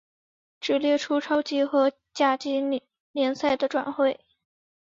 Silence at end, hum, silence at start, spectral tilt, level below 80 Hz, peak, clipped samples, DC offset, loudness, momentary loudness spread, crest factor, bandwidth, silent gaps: 0.75 s; none; 0.6 s; -3.5 dB/octave; -70 dBFS; -10 dBFS; under 0.1%; under 0.1%; -25 LUFS; 7 LU; 18 dB; 7.6 kHz; 3.00-3.14 s